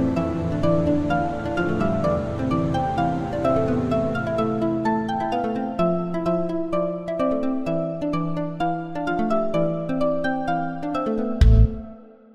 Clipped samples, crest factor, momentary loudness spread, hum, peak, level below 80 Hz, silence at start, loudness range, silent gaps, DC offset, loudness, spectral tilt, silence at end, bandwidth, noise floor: under 0.1%; 18 dB; 5 LU; none; -4 dBFS; -30 dBFS; 0 s; 2 LU; none; under 0.1%; -23 LUFS; -8.5 dB/octave; 0.25 s; 9.2 kHz; -42 dBFS